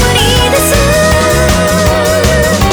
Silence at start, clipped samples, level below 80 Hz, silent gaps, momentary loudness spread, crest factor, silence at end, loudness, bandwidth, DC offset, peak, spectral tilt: 0 s; under 0.1%; -18 dBFS; none; 1 LU; 8 dB; 0 s; -8 LUFS; over 20 kHz; under 0.1%; 0 dBFS; -4 dB/octave